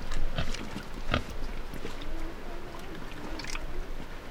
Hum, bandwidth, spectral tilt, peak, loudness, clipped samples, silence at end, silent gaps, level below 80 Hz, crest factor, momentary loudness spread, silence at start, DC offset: none; 10 kHz; -4.5 dB/octave; -10 dBFS; -38 LUFS; under 0.1%; 0 s; none; -34 dBFS; 20 dB; 10 LU; 0 s; under 0.1%